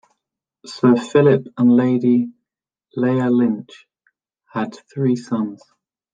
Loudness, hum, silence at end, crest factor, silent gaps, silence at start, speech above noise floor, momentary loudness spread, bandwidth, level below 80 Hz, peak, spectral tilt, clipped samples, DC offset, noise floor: -18 LUFS; none; 0.6 s; 18 dB; none; 0.65 s; 67 dB; 14 LU; 7.8 kHz; -66 dBFS; -2 dBFS; -8 dB/octave; under 0.1%; under 0.1%; -84 dBFS